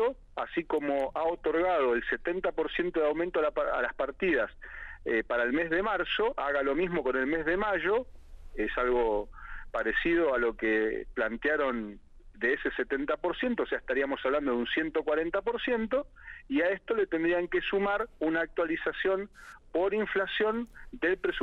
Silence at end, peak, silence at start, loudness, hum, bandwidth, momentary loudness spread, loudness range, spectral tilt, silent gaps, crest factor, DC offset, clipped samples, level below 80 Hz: 0 s; -16 dBFS; 0 s; -30 LUFS; none; 7 kHz; 7 LU; 1 LU; -6.5 dB/octave; none; 14 dB; under 0.1%; under 0.1%; -50 dBFS